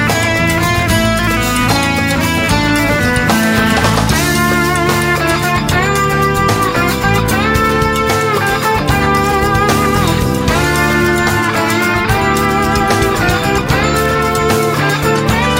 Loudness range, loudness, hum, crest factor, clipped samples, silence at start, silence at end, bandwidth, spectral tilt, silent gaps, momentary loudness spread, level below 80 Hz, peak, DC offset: 1 LU; -12 LUFS; none; 12 dB; under 0.1%; 0 s; 0 s; 16.5 kHz; -4.5 dB/octave; none; 1 LU; -26 dBFS; 0 dBFS; under 0.1%